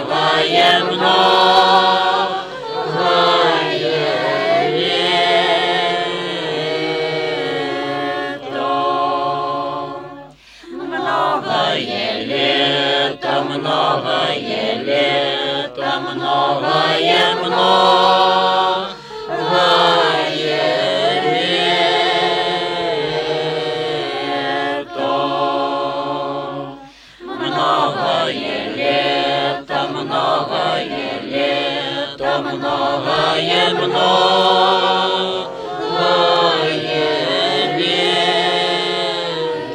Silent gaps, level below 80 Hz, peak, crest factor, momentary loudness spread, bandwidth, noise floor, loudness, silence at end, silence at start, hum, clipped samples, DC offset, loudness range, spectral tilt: none; -56 dBFS; 0 dBFS; 16 dB; 10 LU; 12.5 kHz; -39 dBFS; -16 LUFS; 0 s; 0 s; none; under 0.1%; under 0.1%; 6 LU; -4 dB/octave